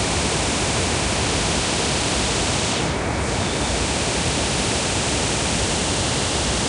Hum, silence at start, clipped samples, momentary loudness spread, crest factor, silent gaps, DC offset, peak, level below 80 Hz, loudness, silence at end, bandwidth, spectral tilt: none; 0 s; under 0.1%; 2 LU; 12 dB; none; under 0.1%; -8 dBFS; -32 dBFS; -20 LUFS; 0 s; 10.5 kHz; -3 dB/octave